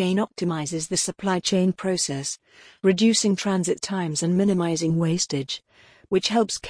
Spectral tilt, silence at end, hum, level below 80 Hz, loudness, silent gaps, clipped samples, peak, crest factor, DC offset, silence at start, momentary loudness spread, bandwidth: -4.5 dB/octave; 0 s; none; -60 dBFS; -23 LUFS; none; under 0.1%; -8 dBFS; 16 dB; under 0.1%; 0 s; 8 LU; 10.5 kHz